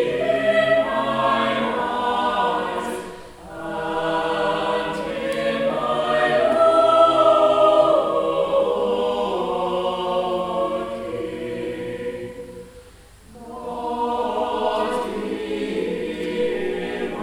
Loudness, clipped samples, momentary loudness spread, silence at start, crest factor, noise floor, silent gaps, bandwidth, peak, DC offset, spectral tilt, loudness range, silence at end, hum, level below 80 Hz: -21 LUFS; under 0.1%; 14 LU; 0 s; 18 dB; -46 dBFS; none; 13 kHz; -4 dBFS; under 0.1%; -5 dB/octave; 11 LU; 0 s; none; -50 dBFS